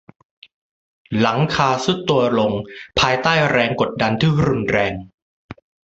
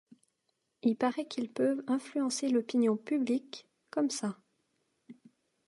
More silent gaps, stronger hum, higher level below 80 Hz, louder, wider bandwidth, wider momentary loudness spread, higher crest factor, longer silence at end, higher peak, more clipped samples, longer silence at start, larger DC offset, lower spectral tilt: first, 5.14-5.49 s vs none; neither; first, -44 dBFS vs -86 dBFS; first, -18 LUFS vs -32 LUFS; second, 8 kHz vs 11.5 kHz; about the same, 7 LU vs 9 LU; about the same, 18 dB vs 16 dB; second, 0.35 s vs 0.55 s; first, 0 dBFS vs -16 dBFS; neither; first, 1.1 s vs 0.85 s; neither; about the same, -5.5 dB/octave vs -4.5 dB/octave